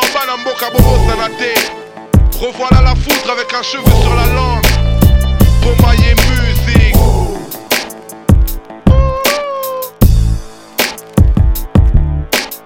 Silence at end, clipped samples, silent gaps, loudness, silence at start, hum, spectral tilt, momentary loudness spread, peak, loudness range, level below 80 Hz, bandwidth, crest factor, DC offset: 0.05 s; 1%; none; -12 LUFS; 0 s; none; -5 dB/octave; 8 LU; 0 dBFS; 3 LU; -14 dBFS; 18.5 kHz; 10 dB; under 0.1%